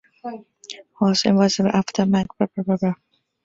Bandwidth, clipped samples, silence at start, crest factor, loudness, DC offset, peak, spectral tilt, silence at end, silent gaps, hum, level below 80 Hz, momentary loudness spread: 7.8 kHz; under 0.1%; 0.25 s; 18 dB; -20 LUFS; under 0.1%; -4 dBFS; -5.5 dB/octave; 0.5 s; none; none; -58 dBFS; 20 LU